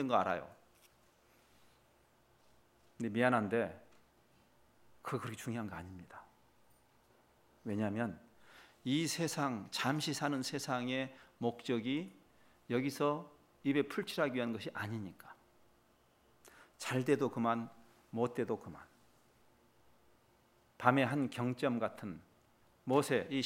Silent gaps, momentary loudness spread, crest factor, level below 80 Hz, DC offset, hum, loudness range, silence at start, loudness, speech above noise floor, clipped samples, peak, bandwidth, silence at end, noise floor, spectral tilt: none; 18 LU; 28 dB; -78 dBFS; under 0.1%; none; 7 LU; 0 s; -37 LUFS; 34 dB; under 0.1%; -10 dBFS; 16 kHz; 0 s; -70 dBFS; -5 dB/octave